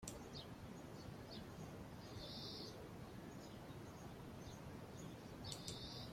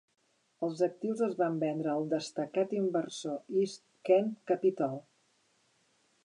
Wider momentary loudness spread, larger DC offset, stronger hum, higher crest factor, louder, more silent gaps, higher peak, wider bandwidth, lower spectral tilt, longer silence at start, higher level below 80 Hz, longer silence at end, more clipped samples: second, 5 LU vs 9 LU; neither; neither; about the same, 22 dB vs 18 dB; second, -53 LUFS vs -32 LUFS; neither; second, -30 dBFS vs -14 dBFS; first, 16.5 kHz vs 11 kHz; second, -4.5 dB/octave vs -6 dB/octave; second, 0 s vs 0.6 s; first, -66 dBFS vs -90 dBFS; second, 0 s vs 1.25 s; neither